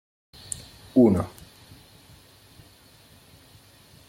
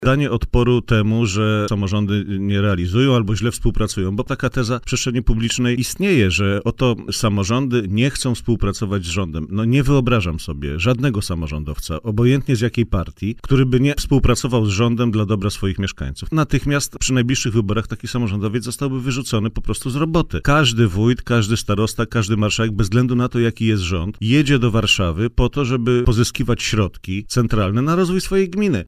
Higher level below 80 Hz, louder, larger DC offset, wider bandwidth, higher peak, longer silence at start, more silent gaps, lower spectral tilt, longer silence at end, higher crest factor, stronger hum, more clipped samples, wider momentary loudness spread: second, -58 dBFS vs -30 dBFS; second, -24 LUFS vs -19 LUFS; neither; about the same, 16.5 kHz vs 15.5 kHz; second, -8 dBFS vs -2 dBFS; first, 0.95 s vs 0 s; neither; first, -7 dB/octave vs -5.5 dB/octave; first, 2.8 s vs 0 s; first, 20 dB vs 14 dB; neither; neither; first, 29 LU vs 7 LU